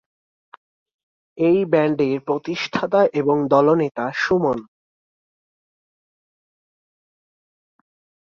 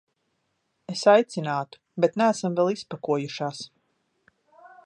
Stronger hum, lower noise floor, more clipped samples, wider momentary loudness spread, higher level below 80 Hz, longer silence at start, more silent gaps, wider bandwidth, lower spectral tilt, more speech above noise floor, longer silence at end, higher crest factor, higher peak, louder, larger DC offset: neither; first, under -90 dBFS vs -75 dBFS; neither; second, 8 LU vs 16 LU; first, -62 dBFS vs -78 dBFS; first, 1.35 s vs 0.9 s; neither; second, 7.2 kHz vs 11 kHz; first, -7 dB/octave vs -5.5 dB/octave; first, over 72 dB vs 51 dB; first, 3.7 s vs 1.2 s; about the same, 20 dB vs 22 dB; about the same, -2 dBFS vs -4 dBFS; first, -19 LUFS vs -24 LUFS; neither